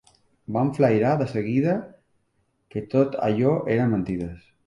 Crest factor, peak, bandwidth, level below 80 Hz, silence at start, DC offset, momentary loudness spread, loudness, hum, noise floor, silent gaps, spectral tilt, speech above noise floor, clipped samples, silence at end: 18 dB; -6 dBFS; 11 kHz; -54 dBFS; 0.5 s; under 0.1%; 11 LU; -23 LUFS; none; -70 dBFS; none; -9 dB/octave; 48 dB; under 0.1%; 0.25 s